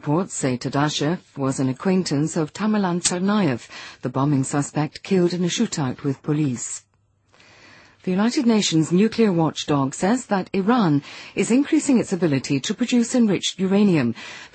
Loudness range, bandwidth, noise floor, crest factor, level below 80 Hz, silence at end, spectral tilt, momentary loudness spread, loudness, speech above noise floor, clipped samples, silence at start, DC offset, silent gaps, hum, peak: 4 LU; 8.8 kHz; -61 dBFS; 16 dB; -60 dBFS; 0.1 s; -5 dB/octave; 7 LU; -21 LUFS; 41 dB; under 0.1%; 0 s; under 0.1%; none; none; -4 dBFS